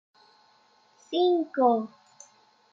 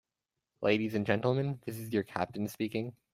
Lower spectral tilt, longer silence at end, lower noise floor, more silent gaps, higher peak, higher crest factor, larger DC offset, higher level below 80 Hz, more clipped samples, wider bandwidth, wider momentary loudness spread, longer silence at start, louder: second, -5 dB/octave vs -6.5 dB/octave; first, 0.85 s vs 0.2 s; second, -62 dBFS vs -89 dBFS; neither; about the same, -10 dBFS vs -12 dBFS; about the same, 20 dB vs 20 dB; neither; second, -88 dBFS vs -70 dBFS; neither; second, 7.6 kHz vs 16 kHz; about the same, 9 LU vs 7 LU; first, 1.1 s vs 0.6 s; first, -25 LUFS vs -33 LUFS